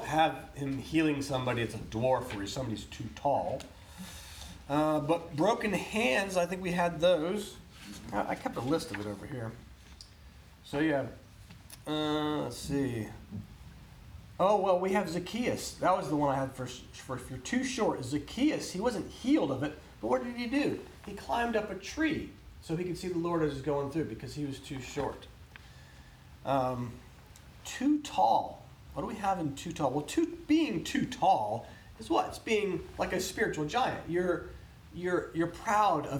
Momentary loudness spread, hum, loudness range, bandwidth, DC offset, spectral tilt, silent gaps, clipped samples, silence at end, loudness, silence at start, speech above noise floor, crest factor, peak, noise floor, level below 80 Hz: 18 LU; none; 6 LU; 19.5 kHz; under 0.1%; -5.5 dB/octave; none; under 0.1%; 0 s; -32 LUFS; 0 s; 22 dB; 18 dB; -14 dBFS; -54 dBFS; -54 dBFS